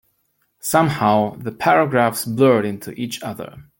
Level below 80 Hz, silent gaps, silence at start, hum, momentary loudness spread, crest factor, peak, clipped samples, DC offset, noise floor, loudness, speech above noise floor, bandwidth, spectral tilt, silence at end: -58 dBFS; none; 0.65 s; none; 13 LU; 18 dB; -2 dBFS; under 0.1%; under 0.1%; -67 dBFS; -18 LUFS; 49 dB; 17 kHz; -5.5 dB/octave; 0.15 s